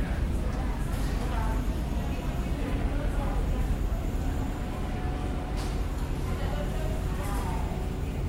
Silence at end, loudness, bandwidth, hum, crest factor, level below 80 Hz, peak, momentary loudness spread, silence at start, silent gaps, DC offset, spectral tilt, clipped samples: 0 s; -32 LUFS; 16 kHz; none; 12 dB; -30 dBFS; -16 dBFS; 2 LU; 0 s; none; under 0.1%; -6.5 dB/octave; under 0.1%